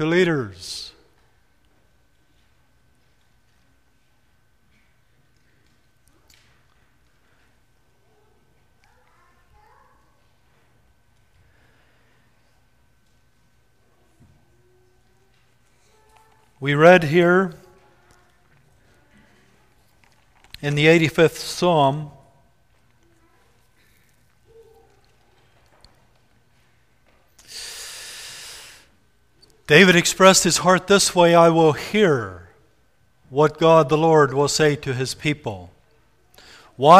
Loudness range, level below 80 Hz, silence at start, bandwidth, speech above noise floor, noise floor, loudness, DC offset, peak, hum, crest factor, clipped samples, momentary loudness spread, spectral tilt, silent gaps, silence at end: 22 LU; -56 dBFS; 0 s; 15.5 kHz; 47 dB; -64 dBFS; -17 LUFS; under 0.1%; 0 dBFS; none; 22 dB; under 0.1%; 22 LU; -4.5 dB/octave; none; 0 s